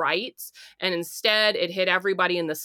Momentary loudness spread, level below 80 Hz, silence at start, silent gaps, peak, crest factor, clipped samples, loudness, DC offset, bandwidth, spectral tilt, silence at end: 14 LU; -78 dBFS; 0 s; none; -6 dBFS; 18 dB; under 0.1%; -23 LUFS; under 0.1%; 19 kHz; -3 dB/octave; 0 s